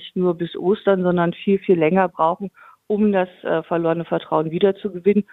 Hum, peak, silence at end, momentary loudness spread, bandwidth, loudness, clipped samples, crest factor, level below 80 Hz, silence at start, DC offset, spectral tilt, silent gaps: none; -2 dBFS; 0.1 s; 6 LU; 4.1 kHz; -20 LUFS; under 0.1%; 18 dB; -60 dBFS; 0 s; under 0.1%; -9.5 dB/octave; none